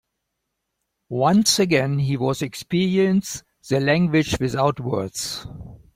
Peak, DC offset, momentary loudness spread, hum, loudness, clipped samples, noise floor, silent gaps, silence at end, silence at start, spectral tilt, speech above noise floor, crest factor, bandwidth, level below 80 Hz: -4 dBFS; under 0.1%; 14 LU; none; -21 LUFS; under 0.1%; -78 dBFS; none; 0.2 s; 1.1 s; -5 dB/octave; 58 dB; 18 dB; 16.5 kHz; -50 dBFS